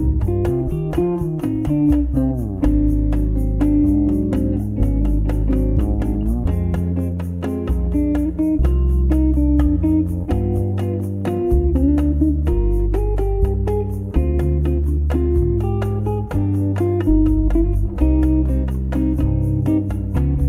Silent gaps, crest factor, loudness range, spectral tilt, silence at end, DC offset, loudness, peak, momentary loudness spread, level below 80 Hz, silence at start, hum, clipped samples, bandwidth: none; 14 dB; 2 LU; -10 dB/octave; 0 s; under 0.1%; -19 LUFS; -4 dBFS; 5 LU; -20 dBFS; 0 s; none; under 0.1%; 10.5 kHz